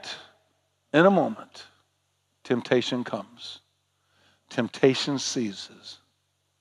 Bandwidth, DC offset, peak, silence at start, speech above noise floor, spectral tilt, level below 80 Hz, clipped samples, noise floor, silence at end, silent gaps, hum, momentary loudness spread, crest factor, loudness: 11 kHz; under 0.1%; -6 dBFS; 0.05 s; 48 dB; -4.5 dB/octave; -84 dBFS; under 0.1%; -73 dBFS; 0.65 s; none; none; 23 LU; 22 dB; -25 LUFS